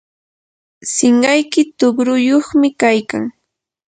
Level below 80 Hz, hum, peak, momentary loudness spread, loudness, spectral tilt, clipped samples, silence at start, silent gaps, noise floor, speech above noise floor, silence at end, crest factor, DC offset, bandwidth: -58 dBFS; none; 0 dBFS; 11 LU; -14 LUFS; -3 dB/octave; under 0.1%; 0.85 s; none; -74 dBFS; 60 dB; 0.6 s; 16 dB; under 0.1%; 9.4 kHz